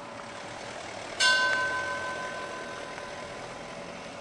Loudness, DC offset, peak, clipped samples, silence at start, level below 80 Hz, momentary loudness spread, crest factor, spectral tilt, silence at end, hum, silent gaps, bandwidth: -30 LUFS; under 0.1%; -10 dBFS; under 0.1%; 0 s; -64 dBFS; 17 LU; 22 dB; -1 dB/octave; 0 s; none; none; 11.5 kHz